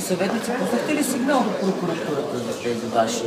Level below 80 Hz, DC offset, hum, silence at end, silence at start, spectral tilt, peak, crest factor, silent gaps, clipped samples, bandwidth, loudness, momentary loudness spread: -64 dBFS; under 0.1%; none; 0 s; 0 s; -4.5 dB/octave; -6 dBFS; 16 dB; none; under 0.1%; 16 kHz; -23 LUFS; 5 LU